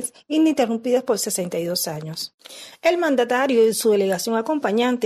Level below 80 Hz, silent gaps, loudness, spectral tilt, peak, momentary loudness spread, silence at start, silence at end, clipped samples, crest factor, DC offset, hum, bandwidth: -68 dBFS; 2.34-2.38 s; -21 LUFS; -4 dB/octave; -6 dBFS; 12 LU; 0 s; 0 s; under 0.1%; 14 dB; under 0.1%; none; 13.5 kHz